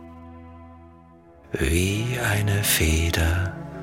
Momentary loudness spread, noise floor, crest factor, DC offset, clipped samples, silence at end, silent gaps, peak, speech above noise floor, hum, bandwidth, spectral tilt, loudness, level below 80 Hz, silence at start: 23 LU; -50 dBFS; 20 dB; under 0.1%; under 0.1%; 0 s; none; -6 dBFS; 28 dB; none; 17 kHz; -4 dB/octave; -23 LUFS; -34 dBFS; 0 s